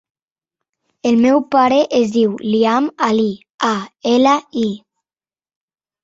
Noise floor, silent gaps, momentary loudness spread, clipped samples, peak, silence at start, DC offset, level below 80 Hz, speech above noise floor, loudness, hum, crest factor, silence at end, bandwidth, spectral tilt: under -90 dBFS; 3.50-3.58 s; 8 LU; under 0.1%; -2 dBFS; 1.05 s; under 0.1%; -60 dBFS; over 75 dB; -16 LUFS; none; 16 dB; 1.25 s; 7.8 kHz; -5.5 dB/octave